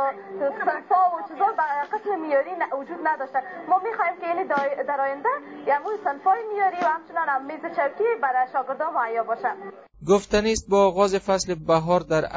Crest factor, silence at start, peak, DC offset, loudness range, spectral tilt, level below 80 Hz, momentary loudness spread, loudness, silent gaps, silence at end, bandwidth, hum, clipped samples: 18 dB; 0 s; -6 dBFS; under 0.1%; 3 LU; -4.5 dB/octave; -52 dBFS; 7 LU; -24 LUFS; none; 0 s; 8 kHz; none; under 0.1%